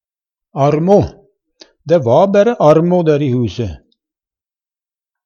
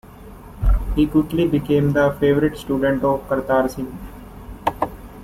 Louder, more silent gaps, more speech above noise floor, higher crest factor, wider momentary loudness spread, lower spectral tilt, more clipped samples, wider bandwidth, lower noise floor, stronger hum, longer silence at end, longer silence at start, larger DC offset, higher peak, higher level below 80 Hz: first, -13 LUFS vs -20 LUFS; neither; first, over 78 dB vs 21 dB; about the same, 14 dB vs 16 dB; about the same, 14 LU vs 16 LU; about the same, -8 dB/octave vs -7.5 dB/octave; neither; second, 7 kHz vs 16 kHz; first, under -90 dBFS vs -39 dBFS; neither; first, 1.5 s vs 0 s; first, 0.55 s vs 0.05 s; neither; first, 0 dBFS vs -4 dBFS; second, -44 dBFS vs -28 dBFS